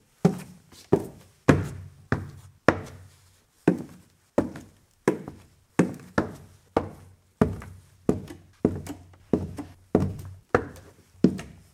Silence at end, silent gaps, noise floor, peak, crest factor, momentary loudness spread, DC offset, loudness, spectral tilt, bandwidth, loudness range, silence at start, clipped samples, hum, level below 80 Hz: 0.2 s; none; -60 dBFS; 0 dBFS; 28 dB; 18 LU; under 0.1%; -28 LUFS; -7.5 dB/octave; 15.5 kHz; 3 LU; 0.25 s; under 0.1%; none; -50 dBFS